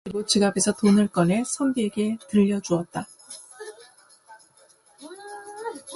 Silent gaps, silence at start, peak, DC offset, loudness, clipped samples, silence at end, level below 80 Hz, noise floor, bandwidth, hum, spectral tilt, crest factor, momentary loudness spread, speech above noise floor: none; 0.05 s; -6 dBFS; under 0.1%; -23 LUFS; under 0.1%; 0 s; -62 dBFS; -57 dBFS; 11.5 kHz; none; -5 dB/octave; 20 dB; 21 LU; 35 dB